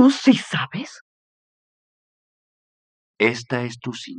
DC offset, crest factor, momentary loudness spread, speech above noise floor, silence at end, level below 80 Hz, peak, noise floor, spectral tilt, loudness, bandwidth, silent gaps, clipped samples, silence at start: under 0.1%; 20 dB; 15 LU; over 69 dB; 0 s; -72 dBFS; -2 dBFS; under -90 dBFS; -5 dB/octave; -21 LUFS; 10 kHz; 1.01-3.14 s; under 0.1%; 0 s